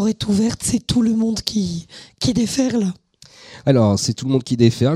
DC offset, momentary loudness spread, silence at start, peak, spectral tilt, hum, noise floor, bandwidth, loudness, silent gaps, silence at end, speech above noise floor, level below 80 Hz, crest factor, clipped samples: under 0.1%; 10 LU; 0 s; 0 dBFS; -5.5 dB/octave; none; -46 dBFS; 14.5 kHz; -19 LUFS; none; 0 s; 28 dB; -44 dBFS; 18 dB; under 0.1%